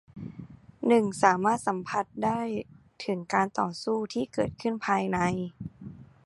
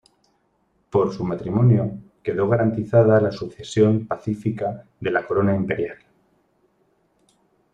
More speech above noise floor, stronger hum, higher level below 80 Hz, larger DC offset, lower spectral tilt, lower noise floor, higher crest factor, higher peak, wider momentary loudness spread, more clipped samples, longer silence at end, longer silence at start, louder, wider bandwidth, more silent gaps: second, 20 dB vs 46 dB; neither; second, -60 dBFS vs -54 dBFS; neither; second, -5.5 dB/octave vs -8.5 dB/octave; second, -47 dBFS vs -66 dBFS; first, 24 dB vs 18 dB; about the same, -6 dBFS vs -4 dBFS; first, 19 LU vs 11 LU; neither; second, 0.2 s vs 1.8 s; second, 0.15 s vs 0.95 s; second, -28 LUFS vs -21 LUFS; first, 11.5 kHz vs 9 kHz; neither